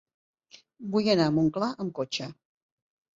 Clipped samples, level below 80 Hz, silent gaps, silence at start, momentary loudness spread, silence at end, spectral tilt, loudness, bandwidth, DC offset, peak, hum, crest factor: under 0.1%; -64 dBFS; none; 0.8 s; 13 LU; 0.85 s; -6 dB/octave; -27 LUFS; 7.8 kHz; under 0.1%; -10 dBFS; none; 20 dB